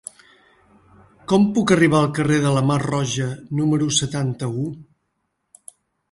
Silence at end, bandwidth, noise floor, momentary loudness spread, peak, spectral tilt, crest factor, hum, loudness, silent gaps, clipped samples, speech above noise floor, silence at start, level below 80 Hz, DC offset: 1.3 s; 11.5 kHz; -73 dBFS; 12 LU; -2 dBFS; -5.5 dB/octave; 18 dB; none; -20 LUFS; none; under 0.1%; 55 dB; 1.3 s; -54 dBFS; under 0.1%